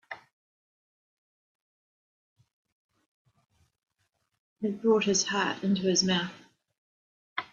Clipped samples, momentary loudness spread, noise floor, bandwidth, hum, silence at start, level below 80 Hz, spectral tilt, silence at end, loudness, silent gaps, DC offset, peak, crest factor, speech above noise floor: under 0.1%; 14 LU; -78 dBFS; 7.8 kHz; none; 0.1 s; -72 dBFS; -3.5 dB/octave; 0.1 s; -27 LUFS; 0.33-2.36 s, 2.53-2.65 s, 2.72-2.89 s, 3.06-3.25 s, 4.39-4.56 s, 6.78-7.36 s; under 0.1%; -12 dBFS; 22 dB; 51 dB